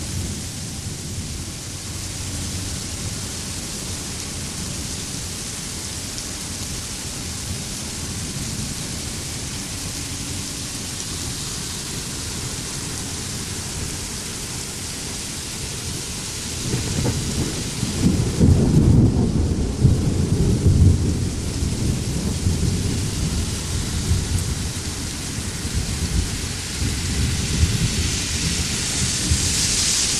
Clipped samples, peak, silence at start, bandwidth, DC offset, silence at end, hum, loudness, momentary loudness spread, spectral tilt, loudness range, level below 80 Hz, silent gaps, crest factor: under 0.1%; -2 dBFS; 0 s; 14.5 kHz; under 0.1%; 0 s; none; -23 LUFS; 10 LU; -4 dB/octave; 8 LU; -30 dBFS; none; 20 dB